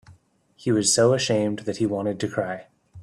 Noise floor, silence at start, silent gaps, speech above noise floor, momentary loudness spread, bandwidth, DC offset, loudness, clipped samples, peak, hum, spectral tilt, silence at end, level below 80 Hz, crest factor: -57 dBFS; 0.1 s; none; 35 dB; 13 LU; 13.5 kHz; under 0.1%; -23 LUFS; under 0.1%; -6 dBFS; none; -4 dB/octave; 0 s; -62 dBFS; 18 dB